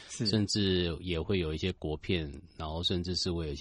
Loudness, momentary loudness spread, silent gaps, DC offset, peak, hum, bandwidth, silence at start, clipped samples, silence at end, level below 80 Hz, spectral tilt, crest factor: -32 LUFS; 9 LU; none; under 0.1%; -16 dBFS; none; 11 kHz; 0 s; under 0.1%; 0 s; -46 dBFS; -5 dB/octave; 16 dB